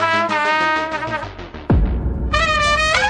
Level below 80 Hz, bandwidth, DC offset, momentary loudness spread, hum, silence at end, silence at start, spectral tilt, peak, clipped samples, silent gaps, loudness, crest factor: -26 dBFS; 10.5 kHz; under 0.1%; 10 LU; none; 0 s; 0 s; -4.5 dB/octave; 0 dBFS; under 0.1%; none; -18 LUFS; 18 dB